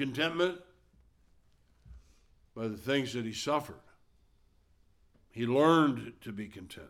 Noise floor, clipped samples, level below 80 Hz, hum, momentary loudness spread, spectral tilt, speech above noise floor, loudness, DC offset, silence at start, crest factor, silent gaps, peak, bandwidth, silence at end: -66 dBFS; under 0.1%; -64 dBFS; none; 21 LU; -5.5 dB/octave; 35 dB; -31 LUFS; under 0.1%; 0 s; 22 dB; none; -14 dBFS; 16 kHz; 0 s